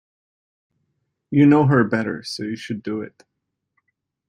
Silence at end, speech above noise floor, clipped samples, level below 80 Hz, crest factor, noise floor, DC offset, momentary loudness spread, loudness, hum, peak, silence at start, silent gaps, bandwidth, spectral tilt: 1.2 s; 55 dB; under 0.1%; -62 dBFS; 18 dB; -73 dBFS; under 0.1%; 15 LU; -20 LUFS; none; -4 dBFS; 1.3 s; none; 11 kHz; -7.5 dB/octave